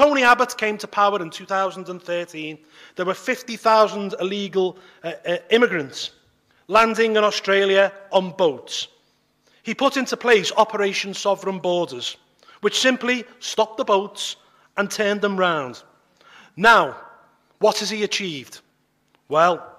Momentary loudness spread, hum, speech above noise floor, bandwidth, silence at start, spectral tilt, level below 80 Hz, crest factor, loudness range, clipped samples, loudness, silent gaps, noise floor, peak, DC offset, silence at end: 14 LU; none; 45 dB; 15.5 kHz; 0 s; -3.5 dB/octave; -64 dBFS; 18 dB; 3 LU; under 0.1%; -20 LUFS; none; -65 dBFS; -4 dBFS; under 0.1%; 0.1 s